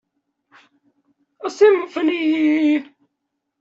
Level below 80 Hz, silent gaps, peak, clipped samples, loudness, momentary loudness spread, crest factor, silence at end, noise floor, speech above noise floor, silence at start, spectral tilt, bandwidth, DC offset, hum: -70 dBFS; none; -4 dBFS; under 0.1%; -17 LUFS; 11 LU; 18 dB; 0.75 s; -77 dBFS; 61 dB; 1.45 s; -4 dB/octave; 7.6 kHz; under 0.1%; none